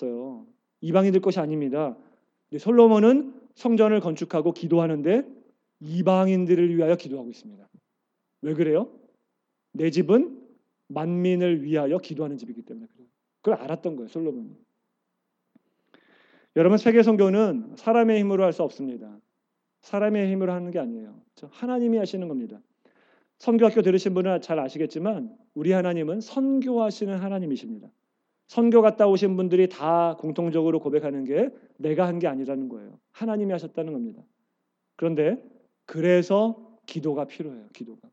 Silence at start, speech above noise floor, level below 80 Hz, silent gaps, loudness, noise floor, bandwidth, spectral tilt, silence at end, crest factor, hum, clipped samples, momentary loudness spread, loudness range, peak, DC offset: 0 s; 56 dB; under -90 dBFS; none; -23 LUFS; -79 dBFS; 7.8 kHz; -8 dB/octave; 0.15 s; 20 dB; none; under 0.1%; 18 LU; 8 LU; -4 dBFS; under 0.1%